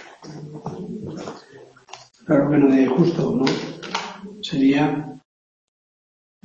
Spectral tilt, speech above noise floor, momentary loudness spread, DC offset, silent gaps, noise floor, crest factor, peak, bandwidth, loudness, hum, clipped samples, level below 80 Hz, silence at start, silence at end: -6.5 dB/octave; 29 dB; 21 LU; under 0.1%; none; -46 dBFS; 20 dB; -4 dBFS; 7.6 kHz; -20 LUFS; none; under 0.1%; -58 dBFS; 0 s; 1.25 s